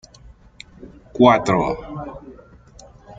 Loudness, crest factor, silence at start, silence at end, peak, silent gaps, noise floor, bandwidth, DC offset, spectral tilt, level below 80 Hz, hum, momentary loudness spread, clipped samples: -17 LUFS; 20 dB; 0.8 s; 0.05 s; -2 dBFS; none; -46 dBFS; 7.8 kHz; under 0.1%; -6.5 dB/octave; -46 dBFS; none; 26 LU; under 0.1%